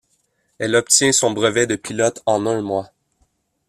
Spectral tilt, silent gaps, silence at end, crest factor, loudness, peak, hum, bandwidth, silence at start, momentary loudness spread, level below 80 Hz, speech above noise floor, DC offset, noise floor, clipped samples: -2.5 dB/octave; none; 0.85 s; 20 dB; -18 LUFS; 0 dBFS; none; 15 kHz; 0.6 s; 11 LU; -58 dBFS; 48 dB; under 0.1%; -66 dBFS; under 0.1%